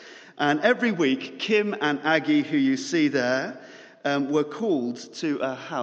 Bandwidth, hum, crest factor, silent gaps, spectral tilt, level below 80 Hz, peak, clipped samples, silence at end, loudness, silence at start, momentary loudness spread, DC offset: 8 kHz; none; 18 dB; none; -5 dB/octave; -74 dBFS; -6 dBFS; under 0.1%; 0 s; -24 LUFS; 0 s; 9 LU; under 0.1%